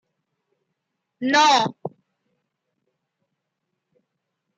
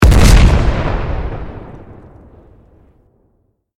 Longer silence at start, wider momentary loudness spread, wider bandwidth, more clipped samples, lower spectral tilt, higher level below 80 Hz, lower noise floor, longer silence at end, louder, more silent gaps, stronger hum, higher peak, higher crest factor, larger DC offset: first, 1.2 s vs 0 s; second, 22 LU vs 25 LU; second, 9.2 kHz vs 15.5 kHz; second, under 0.1% vs 0.1%; second, -2.5 dB/octave vs -5.5 dB/octave; second, -80 dBFS vs -16 dBFS; first, -79 dBFS vs -60 dBFS; first, 2.7 s vs 2 s; second, -18 LUFS vs -13 LUFS; neither; neither; second, -6 dBFS vs 0 dBFS; first, 20 dB vs 14 dB; neither